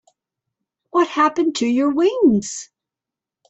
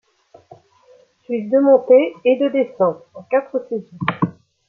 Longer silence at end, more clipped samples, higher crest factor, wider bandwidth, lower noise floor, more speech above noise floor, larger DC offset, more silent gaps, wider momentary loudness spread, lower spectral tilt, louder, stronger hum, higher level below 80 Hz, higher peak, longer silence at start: first, 0.85 s vs 0.35 s; neither; about the same, 16 dB vs 18 dB; first, 8.4 kHz vs 4.3 kHz; first, -87 dBFS vs -52 dBFS; first, 70 dB vs 36 dB; neither; neither; second, 8 LU vs 13 LU; second, -4.5 dB/octave vs -9 dB/octave; about the same, -18 LUFS vs -18 LUFS; neither; first, -60 dBFS vs -66 dBFS; about the same, -4 dBFS vs -2 dBFS; second, 0.95 s vs 1.3 s